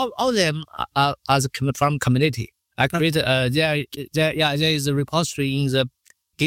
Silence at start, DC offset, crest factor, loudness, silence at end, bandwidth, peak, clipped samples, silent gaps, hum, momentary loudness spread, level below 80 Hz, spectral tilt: 0 s; under 0.1%; 18 dB; -21 LUFS; 0 s; 16.5 kHz; -4 dBFS; under 0.1%; none; none; 7 LU; -50 dBFS; -5 dB/octave